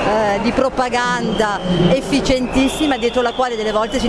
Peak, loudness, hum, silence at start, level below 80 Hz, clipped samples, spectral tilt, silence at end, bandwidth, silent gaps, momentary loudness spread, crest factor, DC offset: 0 dBFS; -17 LUFS; none; 0 s; -34 dBFS; under 0.1%; -5 dB/octave; 0 s; 11 kHz; none; 3 LU; 16 dB; under 0.1%